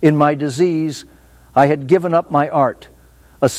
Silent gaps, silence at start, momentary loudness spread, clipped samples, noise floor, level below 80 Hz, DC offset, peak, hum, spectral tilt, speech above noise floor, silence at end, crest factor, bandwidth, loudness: none; 0 s; 9 LU; under 0.1%; -47 dBFS; -52 dBFS; under 0.1%; 0 dBFS; none; -6.5 dB/octave; 32 dB; 0 s; 16 dB; 15.5 kHz; -16 LUFS